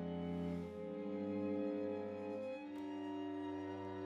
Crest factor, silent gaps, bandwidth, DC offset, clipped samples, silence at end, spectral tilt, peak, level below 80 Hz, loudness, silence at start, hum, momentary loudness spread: 14 dB; none; 7.6 kHz; under 0.1%; under 0.1%; 0 s; -8.5 dB/octave; -30 dBFS; -74 dBFS; -44 LUFS; 0 s; none; 6 LU